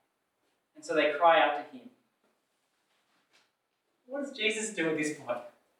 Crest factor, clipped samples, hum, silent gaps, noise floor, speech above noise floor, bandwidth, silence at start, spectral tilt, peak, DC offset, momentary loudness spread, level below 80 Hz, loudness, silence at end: 22 dB; under 0.1%; none; none; -79 dBFS; 50 dB; 13 kHz; 0.85 s; -3 dB/octave; -10 dBFS; under 0.1%; 17 LU; under -90 dBFS; -29 LUFS; 0.3 s